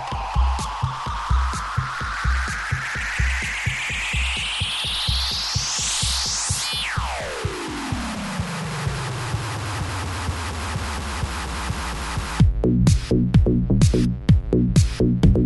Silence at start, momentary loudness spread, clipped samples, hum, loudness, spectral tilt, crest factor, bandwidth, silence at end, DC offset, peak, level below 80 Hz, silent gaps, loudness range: 0 s; 9 LU; under 0.1%; none; -22 LUFS; -4.5 dB/octave; 18 dB; 12 kHz; 0 s; under 0.1%; -4 dBFS; -28 dBFS; none; 7 LU